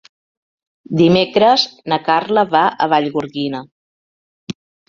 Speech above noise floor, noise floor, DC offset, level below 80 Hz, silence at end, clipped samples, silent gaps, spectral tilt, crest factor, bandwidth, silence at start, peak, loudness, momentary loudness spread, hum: over 75 dB; under -90 dBFS; under 0.1%; -56 dBFS; 0.35 s; under 0.1%; 3.72-4.47 s; -6 dB/octave; 16 dB; 7.4 kHz; 0.9 s; 0 dBFS; -15 LUFS; 16 LU; none